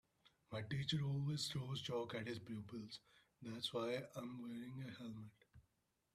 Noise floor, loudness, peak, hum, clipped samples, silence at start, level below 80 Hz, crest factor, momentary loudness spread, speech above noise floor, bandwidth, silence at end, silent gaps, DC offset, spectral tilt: -84 dBFS; -46 LUFS; -30 dBFS; none; under 0.1%; 0.25 s; -76 dBFS; 18 dB; 12 LU; 38 dB; 14 kHz; 0.55 s; none; under 0.1%; -5.5 dB/octave